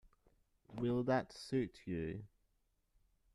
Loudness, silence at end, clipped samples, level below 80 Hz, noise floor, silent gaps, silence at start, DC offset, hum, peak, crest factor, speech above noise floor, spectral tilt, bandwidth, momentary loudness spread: -40 LUFS; 1.1 s; under 0.1%; -66 dBFS; -80 dBFS; none; 0.7 s; under 0.1%; none; -22 dBFS; 20 dB; 41 dB; -7 dB/octave; 12 kHz; 12 LU